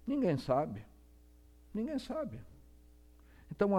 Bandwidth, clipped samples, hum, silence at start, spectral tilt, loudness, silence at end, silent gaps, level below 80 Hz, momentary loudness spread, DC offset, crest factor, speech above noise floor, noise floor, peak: 16 kHz; under 0.1%; 60 Hz at -60 dBFS; 0.05 s; -8 dB/octave; -36 LUFS; 0 s; none; -60 dBFS; 17 LU; under 0.1%; 22 dB; 25 dB; -60 dBFS; -16 dBFS